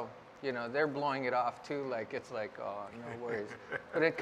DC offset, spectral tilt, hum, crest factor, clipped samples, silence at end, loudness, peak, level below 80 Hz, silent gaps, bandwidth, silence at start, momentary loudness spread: under 0.1%; -6 dB/octave; none; 20 dB; under 0.1%; 0 s; -37 LUFS; -16 dBFS; -76 dBFS; none; 10.5 kHz; 0 s; 10 LU